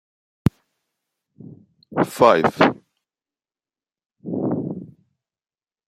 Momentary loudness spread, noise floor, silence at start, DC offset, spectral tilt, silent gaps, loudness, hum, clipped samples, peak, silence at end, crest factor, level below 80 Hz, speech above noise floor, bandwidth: 19 LU; under -90 dBFS; 0.45 s; under 0.1%; -6.5 dB/octave; none; -20 LUFS; none; under 0.1%; -2 dBFS; 1 s; 22 dB; -52 dBFS; over 72 dB; 16 kHz